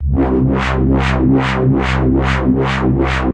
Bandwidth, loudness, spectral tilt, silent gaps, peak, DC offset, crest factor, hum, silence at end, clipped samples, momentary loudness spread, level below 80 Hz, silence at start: 8.8 kHz; -14 LUFS; -7.5 dB/octave; none; 0 dBFS; under 0.1%; 14 dB; none; 0 s; under 0.1%; 2 LU; -20 dBFS; 0 s